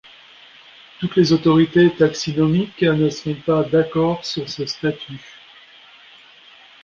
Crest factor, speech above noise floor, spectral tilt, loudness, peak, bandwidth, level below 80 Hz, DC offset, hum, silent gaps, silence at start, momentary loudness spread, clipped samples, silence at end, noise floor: 16 dB; 29 dB; -6.5 dB/octave; -18 LUFS; -2 dBFS; 7.4 kHz; -52 dBFS; under 0.1%; none; none; 1 s; 11 LU; under 0.1%; 1.65 s; -47 dBFS